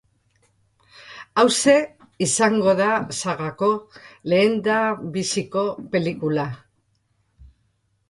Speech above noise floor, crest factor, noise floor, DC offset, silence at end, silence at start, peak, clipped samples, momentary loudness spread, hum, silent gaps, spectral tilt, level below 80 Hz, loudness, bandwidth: 47 dB; 20 dB; -68 dBFS; under 0.1%; 0.65 s; 1 s; -2 dBFS; under 0.1%; 12 LU; none; none; -4 dB/octave; -60 dBFS; -21 LUFS; 11.5 kHz